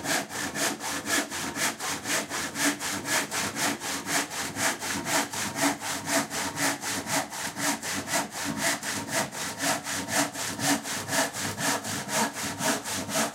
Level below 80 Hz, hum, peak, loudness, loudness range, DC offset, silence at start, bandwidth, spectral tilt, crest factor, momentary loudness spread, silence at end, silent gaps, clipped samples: -64 dBFS; none; -10 dBFS; -28 LUFS; 1 LU; under 0.1%; 0 s; 16 kHz; -1.5 dB/octave; 20 dB; 4 LU; 0 s; none; under 0.1%